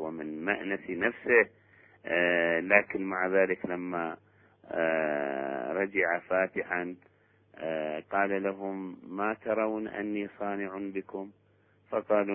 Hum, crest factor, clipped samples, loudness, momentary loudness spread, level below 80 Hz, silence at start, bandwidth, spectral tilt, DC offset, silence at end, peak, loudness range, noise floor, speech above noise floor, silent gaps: none; 24 dB; under 0.1%; -30 LUFS; 14 LU; -70 dBFS; 0 s; 3.6 kHz; -3.5 dB/octave; under 0.1%; 0 s; -6 dBFS; 6 LU; -65 dBFS; 35 dB; none